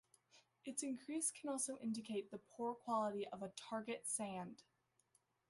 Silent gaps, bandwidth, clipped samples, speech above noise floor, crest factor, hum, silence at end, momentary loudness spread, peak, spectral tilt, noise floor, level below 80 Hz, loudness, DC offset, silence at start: none; 12 kHz; under 0.1%; 35 dB; 18 dB; none; 0.9 s; 9 LU; -28 dBFS; -3.5 dB/octave; -80 dBFS; -88 dBFS; -45 LUFS; under 0.1%; 0.35 s